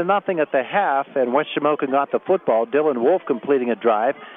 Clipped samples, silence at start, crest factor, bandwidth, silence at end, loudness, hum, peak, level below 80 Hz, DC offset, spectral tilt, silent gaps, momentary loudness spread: under 0.1%; 0 s; 14 dB; 3.9 kHz; 0 s; -20 LUFS; none; -4 dBFS; -78 dBFS; under 0.1%; -9 dB/octave; none; 3 LU